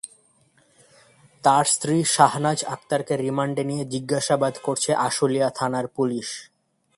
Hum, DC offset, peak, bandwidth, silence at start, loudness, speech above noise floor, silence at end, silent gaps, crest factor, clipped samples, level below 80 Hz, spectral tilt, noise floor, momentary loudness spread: none; under 0.1%; 0 dBFS; 11.5 kHz; 0.05 s; -22 LUFS; 39 dB; 0.55 s; none; 24 dB; under 0.1%; -66 dBFS; -4 dB/octave; -61 dBFS; 9 LU